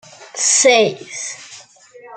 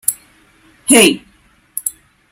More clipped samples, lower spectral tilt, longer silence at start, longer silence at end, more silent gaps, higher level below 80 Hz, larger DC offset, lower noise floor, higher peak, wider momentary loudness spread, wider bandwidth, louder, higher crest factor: second, under 0.1% vs 0.1%; second, -0.5 dB/octave vs -2 dB/octave; about the same, 0.2 s vs 0.1 s; second, 0 s vs 0.4 s; neither; second, -72 dBFS vs -58 dBFS; neither; second, -43 dBFS vs -50 dBFS; about the same, -2 dBFS vs 0 dBFS; about the same, 20 LU vs 18 LU; second, 9.6 kHz vs over 20 kHz; about the same, -13 LUFS vs -13 LUFS; about the same, 18 dB vs 18 dB